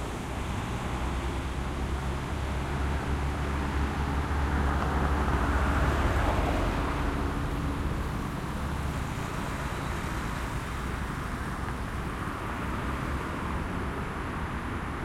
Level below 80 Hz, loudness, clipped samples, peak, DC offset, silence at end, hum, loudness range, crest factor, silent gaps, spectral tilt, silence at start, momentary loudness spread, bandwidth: -34 dBFS; -31 LUFS; under 0.1%; -12 dBFS; under 0.1%; 0 s; none; 5 LU; 18 dB; none; -6 dB/octave; 0 s; 7 LU; 15.5 kHz